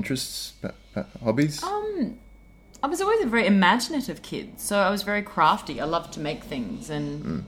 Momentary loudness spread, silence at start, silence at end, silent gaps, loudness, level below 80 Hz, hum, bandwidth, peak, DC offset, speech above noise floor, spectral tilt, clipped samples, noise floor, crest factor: 13 LU; 0 s; 0 s; none; -25 LUFS; -52 dBFS; none; 17 kHz; -4 dBFS; under 0.1%; 25 dB; -4.5 dB/octave; under 0.1%; -50 dBFS; 20 dB